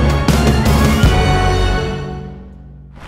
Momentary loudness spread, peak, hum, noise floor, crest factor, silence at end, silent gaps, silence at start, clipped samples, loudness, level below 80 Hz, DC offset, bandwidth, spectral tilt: 16 LU; 0 dBFS; none; -35 dBFS; 14 dB; 0 s; none; 0 s; under 0.1%; -14 LUFS; -18 dBFS; under 0.1%; 16.5 kHz; -6 dB/octave